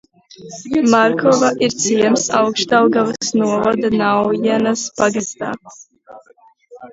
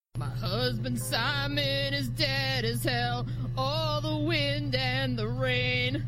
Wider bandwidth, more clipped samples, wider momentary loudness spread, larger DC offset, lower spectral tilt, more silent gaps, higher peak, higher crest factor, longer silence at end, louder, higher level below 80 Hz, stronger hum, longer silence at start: second, 8 kHz vs 16 kHz; neither; first, 11 LU vs 4 LU; neither; about the same, -4 dB/octave vs -5 dB/octave; neither; first, 0 dBFS vs -12 dBFS; about the same, 16 dB vs 16 dB; about the same, 0.05 s vs 0 s; first, -15 LUFS vs -29 LUFS; second, -56 dBFS vs -44 dBFS; neither; first, 0.4 s vs 0.15 s